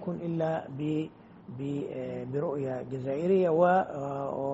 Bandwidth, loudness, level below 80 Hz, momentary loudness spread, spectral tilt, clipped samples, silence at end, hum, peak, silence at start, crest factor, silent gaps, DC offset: 7.8 kHz; -30 LUFS; -68 dBFS; 12 LU; -7.5 dB/octave; under 0.1%; 0 s; none; -12 dBFS; 0 s; 18 dB; none; under 0.1%